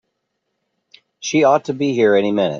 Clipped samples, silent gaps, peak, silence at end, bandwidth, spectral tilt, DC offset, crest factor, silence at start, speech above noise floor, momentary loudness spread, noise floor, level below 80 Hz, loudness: under 0.1%; none; -2 dBFS; 0 s; 7.4 kHz; -5 dB/octave; under 0.1%; 16 dB; 1.2 s; 58 dB; 6 LU; -74 dBFS; -66 dBFS; -16 LUFS